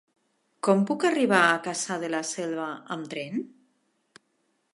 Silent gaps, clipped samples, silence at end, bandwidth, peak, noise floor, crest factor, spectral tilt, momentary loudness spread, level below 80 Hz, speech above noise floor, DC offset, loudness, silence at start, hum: none; under 0.1%; 1.3 s; 11.5 kHz; -6 dBFS; -73 dBFS; 22 dB; -4 dB/octave; 14 LU; -82 dBFS; 47 dB; under 0.1%; -26 LUFS; 0.65 s; none